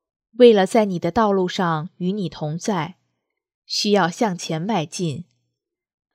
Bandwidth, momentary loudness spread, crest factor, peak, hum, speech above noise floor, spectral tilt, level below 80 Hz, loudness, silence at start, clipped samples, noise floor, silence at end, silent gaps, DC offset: 14.5 kHz; 13 LU; 20 dB; 0 dBFS; none; 60 dB; -5.5 dB/octave; -58 dBFS; -20 LUFS; 0.4 s; under 0.1%; -79 dBFS; 0.9 s; 3.54-3.62 s; under 0.1%